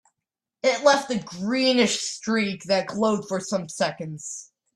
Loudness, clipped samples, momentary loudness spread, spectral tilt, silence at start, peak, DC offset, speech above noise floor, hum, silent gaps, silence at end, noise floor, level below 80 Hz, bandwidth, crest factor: -24 LUFS; under 0.1%; 13 LU; -3.5 dB/octave; 0.65 s; -4 dBFS; under 0.1%; 63 dB; none; none; 0.35 s; -86 dBFS; -68 dBFS; 12.5 kHz; 20 dB